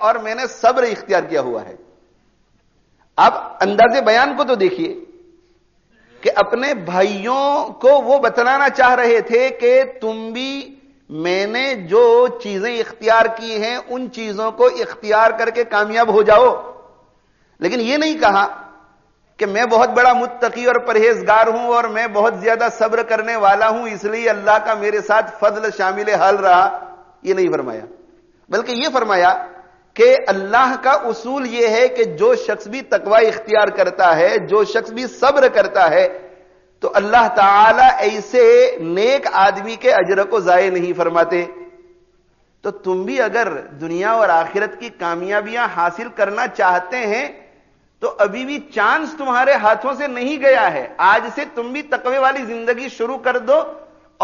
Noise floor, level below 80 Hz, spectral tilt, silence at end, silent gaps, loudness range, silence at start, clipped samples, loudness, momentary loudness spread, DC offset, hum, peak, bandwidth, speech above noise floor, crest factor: -58 dBFS; -56 dBFS; -1.5 dB/octave; 0 s; none; 6 LU; 0 s; under 0.1%; -15 LUFS; 12 LU; under 0.1%; none; -2 dBFS; 7.2 kHz; 43 dB; 14 dB